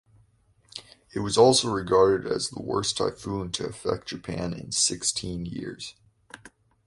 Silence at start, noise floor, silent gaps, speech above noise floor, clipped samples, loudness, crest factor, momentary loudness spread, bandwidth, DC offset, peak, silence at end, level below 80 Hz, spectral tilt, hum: 0.75 s; -63 dBFS; none; 37 dB; under 0.1%; -25 LUFS; 22 dB; 19 LU; 11.5 kHz; under 0.1%; -4 dBFS; 0.4 s; -52 dBFS; -3.5 dB/octave; none